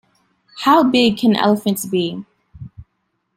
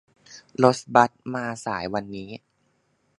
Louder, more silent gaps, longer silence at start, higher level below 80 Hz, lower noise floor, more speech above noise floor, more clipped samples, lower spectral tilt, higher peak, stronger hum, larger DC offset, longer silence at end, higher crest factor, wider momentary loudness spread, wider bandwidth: first, -16 LUFS vs -23 LUFS; neither; first, 0.55 s vs 0.3 s; first, -54 dBFS vs -62 dBFS; about the same, -70 dBFS vs -69 dBFS; first, 55 dB vs 45 dB; neither; about the same, -5 dB/octave vs -5.5 dB/octave; about the same, -2 dBFS vs 0 dBFS; neither; neither; second, 0.55 s vs 0.8 s; second, 16 dB vs 26 dB; second, 9 LU vs 18 LU; first, 16.5 kHz vs 11.5 kHz